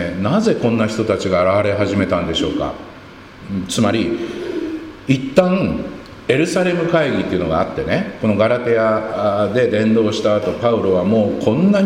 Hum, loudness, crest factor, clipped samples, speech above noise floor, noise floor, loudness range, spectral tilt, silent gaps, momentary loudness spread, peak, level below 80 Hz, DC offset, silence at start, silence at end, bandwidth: none; -17 LUFS; 16 dB; under 0.1%; 21 dB; -37 dBFS; 4 LU; -6 dB/octave; none; 10 LU; 0 dBFS; -44 dBFS; under 0.1%; 0 s; 0 s; 14 kHz